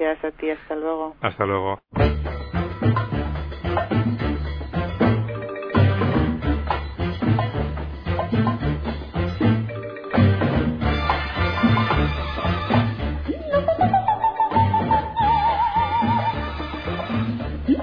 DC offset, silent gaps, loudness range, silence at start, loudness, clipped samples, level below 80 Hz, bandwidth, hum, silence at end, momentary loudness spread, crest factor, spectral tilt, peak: under 0.1%; none; 4 LU; 0 s; -22 LUFS; under 0.1%; -32 dBFS; 5.2 kHz; none; 0 s; 9 LU; 18 dB; -9.5 dB/octave; -4 dBFS